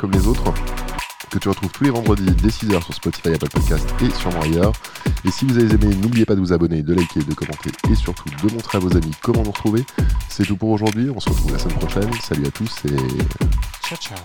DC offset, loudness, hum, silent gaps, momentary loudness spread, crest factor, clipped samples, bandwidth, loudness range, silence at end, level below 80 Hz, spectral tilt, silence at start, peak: 0.5%; -20 LUFS; none; none; 8 LU; 16 dB; under 0.1%; 19.5 kHz; 3 LU; 0 s; -24 dBFS; -6.5 dB/octave; 0 s; -2 dBFS